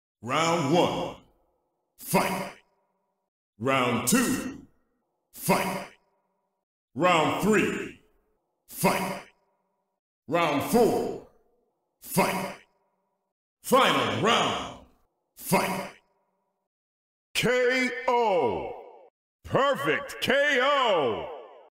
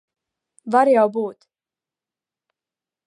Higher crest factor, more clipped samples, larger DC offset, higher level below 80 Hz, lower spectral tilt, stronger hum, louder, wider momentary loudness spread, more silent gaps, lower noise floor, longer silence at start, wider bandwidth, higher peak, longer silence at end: about the same, 18 dB vs 20 dB; neither; neither; first, -60 dBFS vs -82 dBFS; second, -4 dB/octave vs -6.5 dB/octave; neither; second, -25 LUFS vs -18 LUFS; about the same, 17 LU vs 16 LU; first, 3.28-3.53 s, 6.63-6.88 s, 9.99-10.22 s, 13.32-13.57 s, 16.67-17.34 s, 19.10-19.39 s vs none; second, -76 dBFS vs under -90 dBFS; second, 0.25 s vs 0.65 s; first, 16 kHz vs 11 kHz; second, -10 dBFS vs -4 dBFS; second, 0.25 s vs 1.75 s